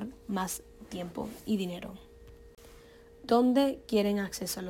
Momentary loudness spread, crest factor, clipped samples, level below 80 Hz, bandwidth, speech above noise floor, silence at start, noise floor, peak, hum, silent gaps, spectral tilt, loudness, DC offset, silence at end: 17 LU; 18 dB; under 0.1%; -58 dBFS; 17 kHz; 24 dB; 0 s; -54 dBFS; -14 dBFS; none; none; -5 dB/octave; -31 LUFS; under 0.1%; 0 s